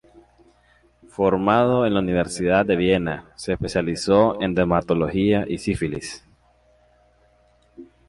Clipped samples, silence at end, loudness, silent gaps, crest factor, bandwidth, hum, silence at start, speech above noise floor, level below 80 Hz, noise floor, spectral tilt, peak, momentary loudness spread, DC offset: under 0.1%; 0.25 s; -21 LUFS; none; 18 dB; 11.5 kHz; 60 Hz at -45 dBFS; 1.2 s; 38 dB; -44 dBFS; -59 dBFS; -6 dB/octave; -4 dBFS; 11 LU; under 0.1%